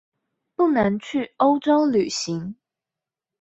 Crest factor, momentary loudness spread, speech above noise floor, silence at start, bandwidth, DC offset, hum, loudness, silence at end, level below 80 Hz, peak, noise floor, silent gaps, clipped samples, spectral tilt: 16 dB; 11 LU; 68 dB; 0.6 s; 8.2 kHz; under 0.1%; none; -21 LUFS; 0.9 s; -58 dBFS; -6 dBFS; -88 dBFS; none; under 0.1%; -5 dB/octave